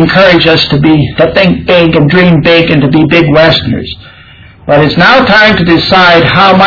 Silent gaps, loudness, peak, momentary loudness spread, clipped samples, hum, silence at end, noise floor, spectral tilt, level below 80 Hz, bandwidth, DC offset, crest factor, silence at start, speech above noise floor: none; -5 LUFS; 0 dBFS; 6 LU; 6%; none; 0 s; -33 dBFS; -7 dB/octave; -30 dBFS; 5.4 kHz; under 0.1%; 6 dB; 0 s; 28 dB